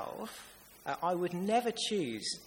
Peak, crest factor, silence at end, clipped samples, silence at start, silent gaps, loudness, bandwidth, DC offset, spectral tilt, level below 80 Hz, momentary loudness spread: -18 dBFS; 18 dB; 0 s; under 0.1%; 0 s; none; -34 LUFS; 17 kHz; under 0.1%; -4 dB/octave; -72 dBFS; 14 LU